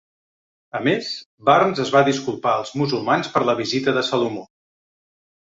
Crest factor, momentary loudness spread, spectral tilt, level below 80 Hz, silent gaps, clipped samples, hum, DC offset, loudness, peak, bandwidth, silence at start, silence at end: 20 dB; 8 LU; -5 dB/octave; -62 dBFS; 1.26-1.38 s; under 0.1%; none; under 0.1%; -20 LUFS; 0 dBFS; 7.8 kHz; 0.75 s; 1 s